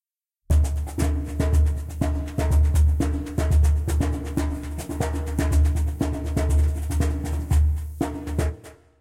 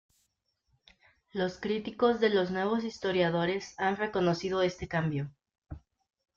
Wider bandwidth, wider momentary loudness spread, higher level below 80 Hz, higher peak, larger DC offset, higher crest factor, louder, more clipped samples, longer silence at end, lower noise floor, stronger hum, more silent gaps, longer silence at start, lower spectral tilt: first, 15 kHz vs 7.6 kHz; second, 7 LU vs 15 LU; first, -26 dBFS vs -60 dBFS; about the same, -10 dBFS vs -12 dBFS; neither; second, 12 dB vs 20 dB; first, -24 LUFS vs -30 LUFS; neither; second, 0.25 s vs 0.6 s; second, -63 dBFS vs -78 dBFS; neither; second, none vs 5.58-5.62 s; second, 0.5 s vs 1.35 s; about the same, -7 dB/octave vs -6 dB/octave